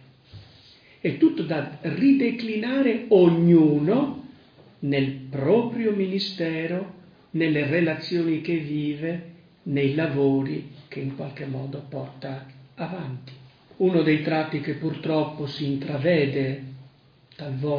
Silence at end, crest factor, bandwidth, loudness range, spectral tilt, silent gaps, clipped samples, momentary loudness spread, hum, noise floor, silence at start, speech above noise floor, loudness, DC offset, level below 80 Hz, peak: 0 s; 18 dB; 5.2 kHz; 7 LU; -9 dB/octave; none; under 0.1%; 15 LU; none; -55 dBFS; 0.35 s; 32 dB; -24 LUFS; under 0.1%; -64 dBFS; -6 dBFS